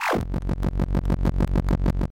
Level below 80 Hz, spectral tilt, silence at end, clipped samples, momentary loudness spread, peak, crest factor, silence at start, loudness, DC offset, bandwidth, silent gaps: -26 dBFS; -7.5 dB/octave; 0 s; under 0.1%; 4 LU; -12 dBFS; 12 dB; 0 s; -25 LUFS; 0.2%; 16 kHz; none